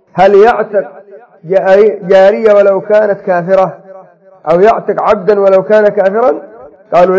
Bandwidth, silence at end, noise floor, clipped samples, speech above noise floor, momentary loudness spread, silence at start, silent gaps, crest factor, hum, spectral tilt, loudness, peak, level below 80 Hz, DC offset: 7.6 kHz; 0 s; -37 dBFS; 2%; 29 dB; 8 LU; 0.15 s; none; 8 dB; none; -7 dB/octave; -9 LUFS; 0 dBFS; -48 dBFS; under 0.1%